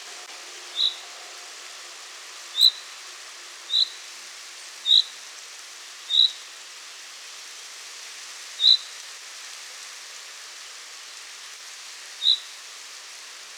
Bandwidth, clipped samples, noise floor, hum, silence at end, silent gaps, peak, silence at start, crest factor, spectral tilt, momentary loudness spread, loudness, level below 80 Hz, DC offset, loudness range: over 20 kHz; under 0.1%; -42 dBFS; none; 0 s; none; -6 dBFS; 0 s; 22 dB; 5.5 dB/octave; 21 LU; -20 LUFS; under -90 dBFS; under 0.1%; 6 LU